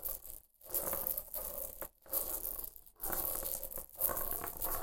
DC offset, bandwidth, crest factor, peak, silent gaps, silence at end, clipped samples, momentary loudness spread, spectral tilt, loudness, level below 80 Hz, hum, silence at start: under 0.1%; 17 kHz; 30 dB; -10 dBFS; none; 0 s; under 0.1%; 10 LU; -2 dB/octave; -38 LUFS; -52 dBFS; none; 0 s